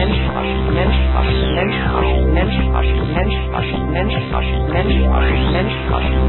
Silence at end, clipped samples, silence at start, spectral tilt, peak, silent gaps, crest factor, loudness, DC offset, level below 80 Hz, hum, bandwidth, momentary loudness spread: 0 s; under 0.1%; 0 s; -12 dB/octave; -2 dBFS; none; 14 dB; -17 LUFS; under 0.1%; -18 dBFS; none; 4.2 kHz; 4 LU